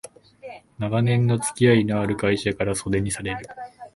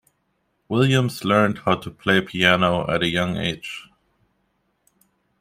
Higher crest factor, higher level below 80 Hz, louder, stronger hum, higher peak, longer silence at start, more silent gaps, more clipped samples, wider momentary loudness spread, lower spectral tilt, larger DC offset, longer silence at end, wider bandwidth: about the same, 20 dB vs 20 dB; first, -48 dBFS vs -54 dBFS; about the same, -22 LUFS vs -20 LUFS; neither; about the same, -4 dBFS vs -2 dBFS; second, 0.05 s vs 0.7 s; neither; neither; first, 21 LU vs 9 LU; about the same, -5.5 dB/octave vs -5.5 dB/octave; neither; second, 0.05 s vs 1.6 s; second, 11.5 kHz vs 16 kHz